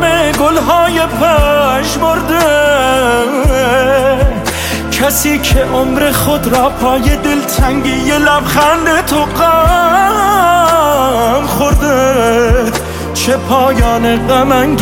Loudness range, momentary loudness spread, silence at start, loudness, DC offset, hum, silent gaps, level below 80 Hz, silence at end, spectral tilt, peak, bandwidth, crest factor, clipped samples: 2 LU; 4 LU; 0 s; -10 LUFS; under 0.1%; none; none; -20 dBFS; 0 s; -4.5 dB/octave; 0 dBFS; 17 kHz; 10 dB; under 0.1%